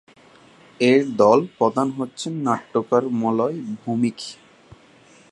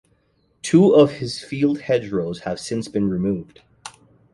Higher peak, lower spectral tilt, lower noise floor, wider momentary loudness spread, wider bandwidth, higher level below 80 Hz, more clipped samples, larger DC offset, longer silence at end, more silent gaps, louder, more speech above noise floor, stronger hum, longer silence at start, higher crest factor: about the same, -2 dBFS vs -2 dBFS; about the same, -6 dB/octave vs -6.5 dB/octave; second, -51 dBFS vs -63 dBFS; second, 12 LU vs 23 LU; about the same, 11.5 kHz vs 11.5 kHz; second, -66 dBFS vs -54 dBFS; neither; neither; first, 0.95 s vs 0.45 s; neither; about the same, -21 LUFS vs -20 LUFS; second, 31 dB vs 44 dB; neither; first, 0.8 s vs 0.65 s; about the same, 20 dB vs 18 dB